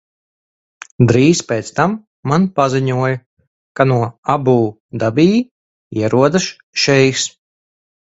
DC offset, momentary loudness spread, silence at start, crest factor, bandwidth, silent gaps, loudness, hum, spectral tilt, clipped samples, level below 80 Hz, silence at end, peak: under 0.1%; 9 LU; 1 s; 16 dB; 8 kHz; 2.07-2.23 s, 3.26-3.37 s, 3.47-3.75 s, 4.18-4.23 s, 4.80-4.89 s, 5.51-5.91 s, 6.63-6.73 s; -15 LUFS; none; -5.5 dB/octave; under 0.1%; -50 dBFS; 0.8 s; 0 dBFS